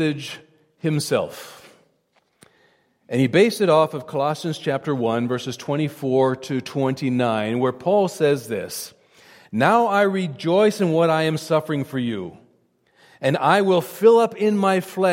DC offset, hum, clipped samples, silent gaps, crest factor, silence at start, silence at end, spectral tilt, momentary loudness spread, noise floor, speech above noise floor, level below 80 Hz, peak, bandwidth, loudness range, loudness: under 0.1%; none; under 0.1%; none; 18 dB; 0 s; 0 s; -6 dB/octave; 11 LU; -65 dBFS; 45 dB; -68 dBFS; -2 dBFS; 16.5 kHz; 3 LU; -21 LUFS